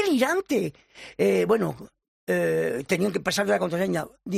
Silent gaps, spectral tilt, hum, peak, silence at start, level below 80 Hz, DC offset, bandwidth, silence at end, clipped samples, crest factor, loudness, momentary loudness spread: 2.08-2.27 s; -5 dB/octave; none; -8 dBFS; 0 s; -62 dBFS; under 0.1%; 14.5 kHz; 0 s; under 0.1%; 16 dB; -25 LUFS; 13 LU